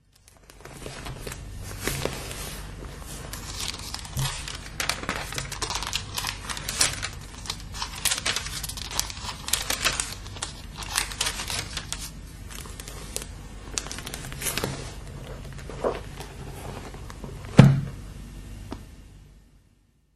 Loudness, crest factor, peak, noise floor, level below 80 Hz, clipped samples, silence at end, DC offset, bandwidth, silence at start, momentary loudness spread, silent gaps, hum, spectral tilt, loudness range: -28 LUFS; 30 dB; 0 dBFS; -62 dBFS; -42 dBFS; under 0.1%; 0.6 s; under 0.1%; 13 kHz; 0.35 s; 16 LU; none; none; -3.5 dB/octave; 8 LU